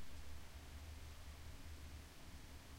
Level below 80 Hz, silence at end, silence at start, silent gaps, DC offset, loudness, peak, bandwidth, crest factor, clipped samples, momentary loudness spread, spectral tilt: -56 dBFS; 0 s; 0 s; none; under 0.1%; -57 LUFS; -40 dBFS; 16 kHz; 12 dB; under 0.1%; 2 LU; -4 dB/octave